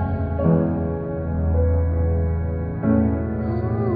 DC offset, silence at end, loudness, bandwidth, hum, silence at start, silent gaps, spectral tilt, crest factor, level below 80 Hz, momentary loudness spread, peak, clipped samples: under 0.1%; 0 s; -22 LUFS; 2.6 kHz; none; 0 s; none; -14 dB/octave; 16 dB; -28 dBFS; 6 LU; -6 dBFS; under 0.1%